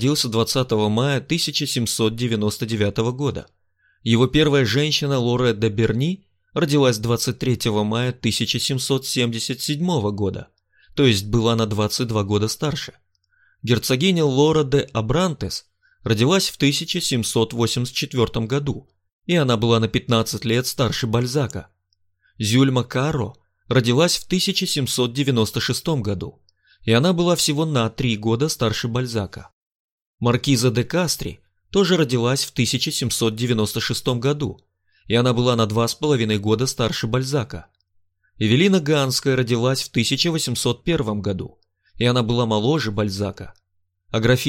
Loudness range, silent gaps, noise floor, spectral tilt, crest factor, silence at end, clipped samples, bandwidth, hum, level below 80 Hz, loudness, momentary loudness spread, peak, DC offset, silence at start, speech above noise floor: 2 LU; 19.12-19.20 s, 29.53-29.98 s, 30.06-30.18 s; -70 dBFS; -5 dB/octave; 18 dB; 0 s; under 0.1%; 16.5 kHz; none; -46 dBFS; -20 LUFS; 9 LU; -2 dBFS; under 0.1%; 0 s; 50 dB